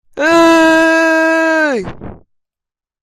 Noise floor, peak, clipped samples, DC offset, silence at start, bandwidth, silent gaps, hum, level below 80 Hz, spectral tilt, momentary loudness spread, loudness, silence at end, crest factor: -87 dBFS; 0 dBFS; under 0.1%; under 0.1%; 0.15 s; 14 kHz; none; none; -46 dBFS; -4 dB/octave; 9 LU; -10 LUFS; 0.9 s; 12 dB